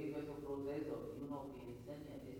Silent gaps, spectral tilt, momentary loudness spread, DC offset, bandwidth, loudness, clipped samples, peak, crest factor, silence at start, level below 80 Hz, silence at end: none; -7.5 dB/octave; 7 LU; under 0.1%; 19.5 kHz; -48 LUFS; under 0.1%; -34 dBFS; 12 dB; 0 s; -66 dBFS; 0 s